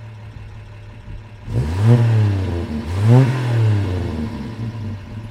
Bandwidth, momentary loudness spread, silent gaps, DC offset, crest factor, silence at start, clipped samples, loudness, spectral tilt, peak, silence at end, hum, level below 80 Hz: 9.6 kHz; 23 LU; none; under 0.1%; 18 dB; 0 s; under 0.1%; -18 LUFS; -8.5 dB/octave; 0 dBFS; 0 s; none; -36 dBFS